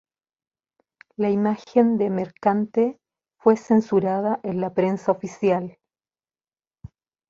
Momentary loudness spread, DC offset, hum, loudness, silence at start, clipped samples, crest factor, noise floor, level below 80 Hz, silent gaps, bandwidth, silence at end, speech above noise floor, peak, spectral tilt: 6 LU; under 0.1%; none; -22 LUFS; 1.2 s; under 0.1%; 20 dB; under -90 dBFS; -62 dBFS; none; 7.4 kHz; 1.6 s; over 69 dB; -4 dBFS; -8 dB/octave